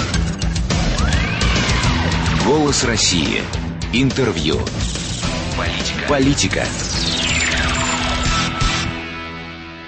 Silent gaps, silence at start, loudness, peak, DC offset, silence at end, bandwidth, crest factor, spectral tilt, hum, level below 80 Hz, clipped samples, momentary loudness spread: none; 0 s; -18 LUFS; -4 dBFS; under 0.1%; 0 s; 8.8 kHz; 14 dB; -4 dB/octave; none; -26 dBFS; under 0.1%; 7 LU